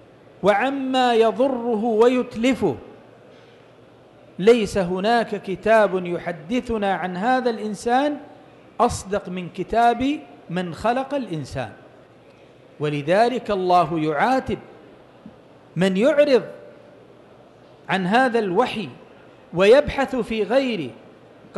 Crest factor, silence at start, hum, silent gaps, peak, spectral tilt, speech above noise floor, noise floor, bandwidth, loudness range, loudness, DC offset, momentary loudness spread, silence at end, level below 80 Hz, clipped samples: 16 dB; 0.45 s; none; none; -6 dBFS; -5.5 dB/octave; 29 dB; -49 dBFS; 12.5 kHz; 4 LU; -21 LUFS; under 0.1%; 13 LU; 0 s; -50 dBFS; under 0.1%